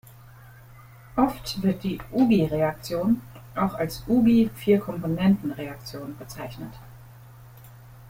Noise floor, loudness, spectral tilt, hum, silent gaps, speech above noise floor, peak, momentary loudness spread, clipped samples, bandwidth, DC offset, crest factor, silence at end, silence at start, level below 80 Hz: -48 dBFS; -24 LUFS; -7 dB/octave; none; none; 24 dB; -6 dBFS; 17 LU; under 0.1%; 16.5 kHz; under 0.1%; 20 dB; 0 s; 0.35 s; -50 dBFS